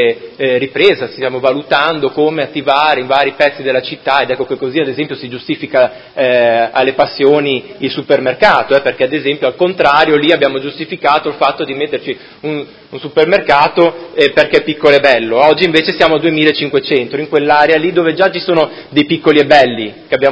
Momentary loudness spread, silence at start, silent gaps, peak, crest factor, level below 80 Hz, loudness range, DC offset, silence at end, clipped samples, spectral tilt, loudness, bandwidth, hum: 9 LU; 0 s; none; 0 dBFS; 12 dB; -52 dBFS; 4 LU; under 0.1%; 0 s; 0.5%; -6 dB/octave; -12 LUFS; 8 kHz; none